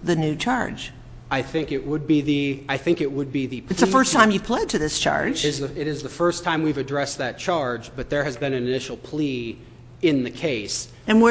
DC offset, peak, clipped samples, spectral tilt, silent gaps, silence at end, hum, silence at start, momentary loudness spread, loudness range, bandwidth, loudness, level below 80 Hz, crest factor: under 0.1%; 0 dBFS; under 0.1%; -4.5 dB/octave; none; 0 s; none; 0 s; 10 LU; 5 LU; 8 kHz; -23 LUFS; -48 dBFS; 22 dB